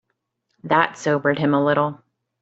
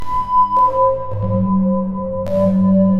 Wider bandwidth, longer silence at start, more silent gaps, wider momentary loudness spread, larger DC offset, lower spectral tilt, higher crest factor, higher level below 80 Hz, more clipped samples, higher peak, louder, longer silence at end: first, 8 kHz vs 5 kHz; first, 0.65 s vs 0 s; neither; about the same, 6 LU vs 7 LU; neither; second, -6 dB/octave vs -11 dB/octave; first, 20 dB vs 10 dB; second, -64 dBFS vs -38 dBFS; neither; about the same, -2 dBFS vs -4 dBFS; second, -20 LUFS vs -16 LUFS; first, 0.45 s vs 0 s